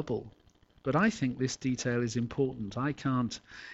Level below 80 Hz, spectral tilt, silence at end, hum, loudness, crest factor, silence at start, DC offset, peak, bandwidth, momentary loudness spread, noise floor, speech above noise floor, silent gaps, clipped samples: -60 dBFS; -5.5 dB/octave; 0 s; none; -32 LUFS; 18 dB; 0 s; under 0.1%; -14 dBFS; 8.2 kHz; 9 LU; -61 dBFS; 30 dB; none; under 0.1%